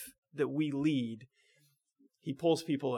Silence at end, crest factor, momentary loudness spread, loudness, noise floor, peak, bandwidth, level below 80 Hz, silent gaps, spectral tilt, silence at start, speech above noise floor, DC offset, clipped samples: 0 s; 18 dB; 15 LU; -34 LUFS; -72 dBFS; -18 dBFS; 16.5 kHz; -78 dBFS; 0.18-0.23 s; -6.5 dB/octave; 0 s; 39 dB; under 0.1%; under 0.1%